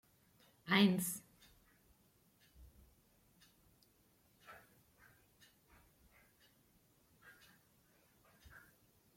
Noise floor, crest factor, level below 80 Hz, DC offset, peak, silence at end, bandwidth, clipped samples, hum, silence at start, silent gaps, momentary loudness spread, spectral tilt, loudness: -73 dBFS; 28 dB; -74 dBFS; under 0.1%; -18 dBFS; 4.6 s; 16.5 kHz; under 0.1%; none; 0.65 s; none; 30 LU; -4.5 dB/octave; -35 LUFS